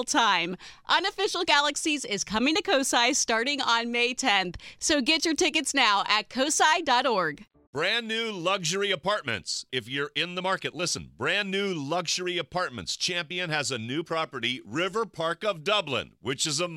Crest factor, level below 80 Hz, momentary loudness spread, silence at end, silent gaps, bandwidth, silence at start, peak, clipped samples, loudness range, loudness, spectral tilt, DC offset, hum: 20 dB; -60 dBFS; 8 LU; 0 s; 7.67-7.73 s; 16.5 kHz; 0 s; -6 dBFS; under 0.1%; 5 LU; -26 LUFS; -2 dB/octave; under 0.1%; none